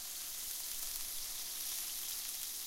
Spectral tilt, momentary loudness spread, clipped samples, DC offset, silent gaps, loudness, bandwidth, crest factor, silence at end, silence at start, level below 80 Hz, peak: 2 dB/octave; 2 LU; under 0.1%; under 0.1%; none; -39 LUFS; 17 kHz; 24 dB; 0 s; 0 s; -62 dBFS; -18 dBFS